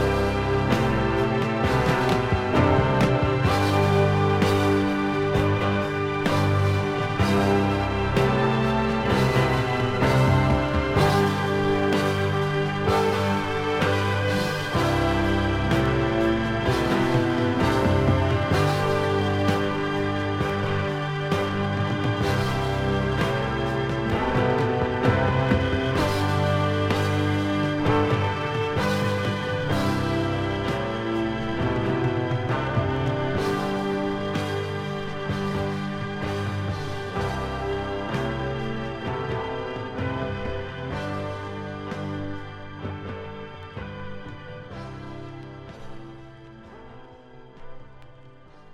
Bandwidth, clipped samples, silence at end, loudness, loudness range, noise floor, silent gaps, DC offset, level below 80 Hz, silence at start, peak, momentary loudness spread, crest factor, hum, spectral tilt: 15.5 kHz; under 0.1%; 0 s; -24 LUFS; 12 LU; -47 dBFS; none; under 0.1%; -40 dBFS; 0 s; -6 dBFS; 11 LU; 18 dB; none; -6.5 dB/octave